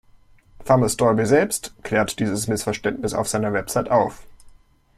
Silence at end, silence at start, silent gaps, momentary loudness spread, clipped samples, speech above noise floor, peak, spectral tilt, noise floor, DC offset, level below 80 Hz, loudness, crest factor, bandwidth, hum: 0.5 s; 0.6 s; none; 7 LU; under 0.1%; 31 dB; -2 dBFS; -5 dB/octave; -52 dBFS; under 0.1%; -48 dBFS; -21 LUFS; 20 dB; 16 kHz; none